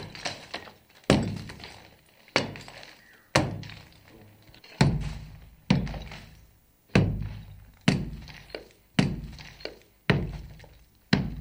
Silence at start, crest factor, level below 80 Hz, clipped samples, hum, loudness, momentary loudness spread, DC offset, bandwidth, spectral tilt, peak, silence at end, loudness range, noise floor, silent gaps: 0 s; 28 dB; -44 dBFS; under 0.1%; none; -29 LUFS; 21 LU; under 0.1%; 16.5 kHz; -5.5 dB/octave; -2 dBFS; 0 s; 3 LU; -59 dBFS; none